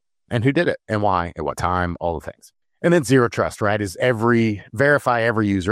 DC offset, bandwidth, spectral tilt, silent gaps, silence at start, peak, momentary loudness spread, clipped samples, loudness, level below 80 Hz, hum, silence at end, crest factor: under 0.1%; 15.5 kHz; -6.5 dB/octave; none; 0.3 s; -4 dBFS; 9 LU; under 0.1%; -20 LUFS; -50 dBFS; none; 0 s; 16 dB